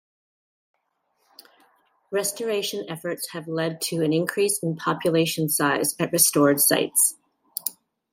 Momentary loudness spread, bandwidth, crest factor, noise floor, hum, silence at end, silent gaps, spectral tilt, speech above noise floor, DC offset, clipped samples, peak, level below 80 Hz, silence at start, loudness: 13 LU; 16.5 kHz; 20 dB; -72 dBFS; none; 0.4 s; none; -3 dB/octave; 49 dB; under 0.1%; under 0.1%; -4 dBFS; -72 dBFS; 2.1 s; -22 LUFS